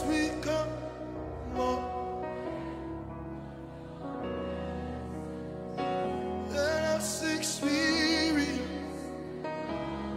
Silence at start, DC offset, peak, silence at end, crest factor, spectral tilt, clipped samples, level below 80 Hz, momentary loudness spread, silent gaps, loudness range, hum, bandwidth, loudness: 0 s; under 0.1%; -16 dBFS; 0 s; 16 dB; -4 dB/octave; under 0.1%; -50 dBFS; 13 LU; none; 9 LU; none; 16 kHz; -33 LUFS